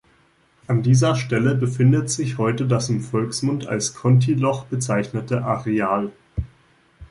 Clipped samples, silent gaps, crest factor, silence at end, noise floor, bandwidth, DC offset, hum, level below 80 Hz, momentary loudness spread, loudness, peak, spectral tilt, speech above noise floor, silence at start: under 0.1%; none; 14 dB; 0.05 s; -59 dBFS; 11.5 kHz; under 0.1%; none; -44 dBFS; 8 LU; -21 LUFS; -6 dBFS; -6 dB/octave; 39 dB; 0.7 s